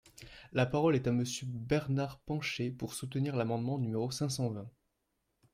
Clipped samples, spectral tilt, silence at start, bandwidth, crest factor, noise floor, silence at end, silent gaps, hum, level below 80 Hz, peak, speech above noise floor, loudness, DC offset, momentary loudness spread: under 0.1%; -6 dB/octave; 0.2 s; 16 kHz; 18 dB; -82 dBFS; 0.85 s; none; none; -62 dBFS; -16 dBFS; 48 dB; -34 LUFS; under 0.1%; 10 LU